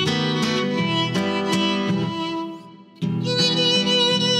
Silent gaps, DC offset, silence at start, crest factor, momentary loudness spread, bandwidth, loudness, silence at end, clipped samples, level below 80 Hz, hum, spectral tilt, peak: none; under 0.1%; 0 s; 16 dB; 11 LU; 14 kHz; -20 LUFS; 0 s; under 0.1%; -66 dBFS; none; -4.5 dB/octave; -6 dBFS